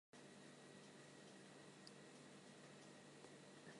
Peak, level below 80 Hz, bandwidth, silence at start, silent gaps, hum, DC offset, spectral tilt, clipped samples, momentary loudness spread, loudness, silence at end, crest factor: -44 dBFS; under -90 dBFS; 11.5 kHz; 0.15 s; none; none; under 0.1%; -4 dB/octave; under 0.1%; 1 LU; -62 LUFS; 0 s; 20 dB